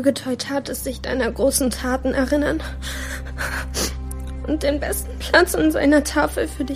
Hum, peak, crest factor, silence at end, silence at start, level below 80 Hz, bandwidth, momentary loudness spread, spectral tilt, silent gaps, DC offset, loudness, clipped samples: none; 0 dBFS; 20 dB; 0 s; 0 s; -32 dBFS; 15.5 kHz; 12 LU; -4 dB/octave; none; 0.1%; -21 LUFS; under 0.1%